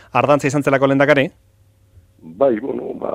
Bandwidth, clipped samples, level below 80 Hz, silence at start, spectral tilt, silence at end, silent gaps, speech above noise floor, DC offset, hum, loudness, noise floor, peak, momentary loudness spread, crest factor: 14 kHz; under 0.1%; -56 dBFS; 0.15 s; -6 dB/octave; 0 s; none; 37 dB; under 0.1%; none; -16 LUFS; -53 dBFS; 0 dBFS; 10 LU; 18 dB